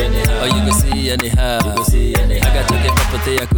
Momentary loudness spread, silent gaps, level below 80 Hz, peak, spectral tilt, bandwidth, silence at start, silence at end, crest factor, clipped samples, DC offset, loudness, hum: 2 LU; none; -16 dBFS; 0 dBFS; -4.5 dB/octave; over 20 kHz; 0 s; 0 s; 14 dB; under 0.1%; under 0.1%; -15 LUFS; none